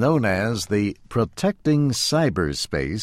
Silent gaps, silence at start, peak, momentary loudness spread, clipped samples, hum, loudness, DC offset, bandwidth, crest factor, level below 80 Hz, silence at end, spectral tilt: none; 0 s; -6 dBFS; 5 LU; under 0.1%; none; -22 LUFS; under 0.1%; 16 kHz; 14 dB; -44 dBFS; 0 s; -5 dB/octave